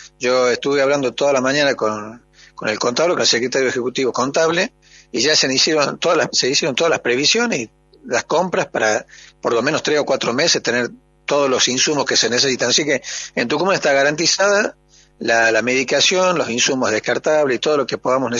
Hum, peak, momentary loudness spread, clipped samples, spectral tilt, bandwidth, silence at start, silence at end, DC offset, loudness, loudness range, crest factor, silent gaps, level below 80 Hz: none; 0 dBFS; 8 LU; under 0.1%; -2.5 dB/octave; 7.8 kHz; 0 s; 0 s; under 0.1%; -17 LUFS; 3 LU; 18 dB; none; -58 dBFS